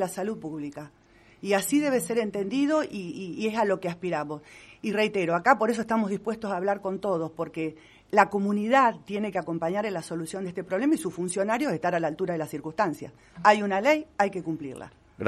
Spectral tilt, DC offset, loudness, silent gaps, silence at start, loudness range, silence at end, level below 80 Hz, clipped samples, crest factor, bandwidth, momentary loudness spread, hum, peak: -5 dB/octave; under 0.1%; -27 LUFS; none; 0 s; 2 LU; 0 s; -66 dBFS; under 0.1%; 22 dB; 13 kHz; 13 LU; none; -4 dBFS